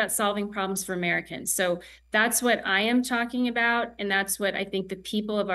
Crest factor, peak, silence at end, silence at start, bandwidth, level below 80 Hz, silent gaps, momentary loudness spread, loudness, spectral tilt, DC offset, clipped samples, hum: 18 dB; -8 dBFS; 0 s; 0 s; 13 kHz; -60 dBFS; none; 7 LU; -26 LUFS; -3 dB/octave; under 0.1%; under 0.1%; none